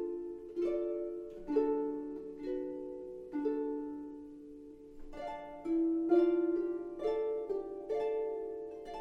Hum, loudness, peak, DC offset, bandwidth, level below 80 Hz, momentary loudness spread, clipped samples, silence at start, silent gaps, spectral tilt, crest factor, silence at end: none; -36 LUFS; -18 dBFS; under 0.1%; 5.6 kHz; -62 dBFS; 15 LU; under 0.1%; 0 s; none; -7.5 dB/octave; 18 dB; 0 s